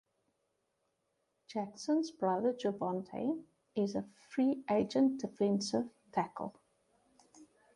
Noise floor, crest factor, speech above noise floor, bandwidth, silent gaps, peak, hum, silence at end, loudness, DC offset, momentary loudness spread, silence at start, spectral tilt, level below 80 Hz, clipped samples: -82 dBFS; 18 dB; 47 dB; 11 kHz; none; -20 dBFS; none; 0.3 s; -35 LUFS; under 0.1%; 10 LU; 1.5 s; -6 dB/octave; -76 dBFS; under 0.1%